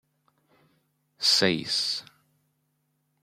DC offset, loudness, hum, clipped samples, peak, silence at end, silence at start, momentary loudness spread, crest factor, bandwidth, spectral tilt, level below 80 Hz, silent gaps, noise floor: under 0.1%; -24 LUFS; none; under 0.1%; -8 dBFS; 1.2 s; 1.2 s; 9 LU; 24 dB; 16.5 kHz; -2.5 dB/octave; -74 dBFS; none; -74 dBFS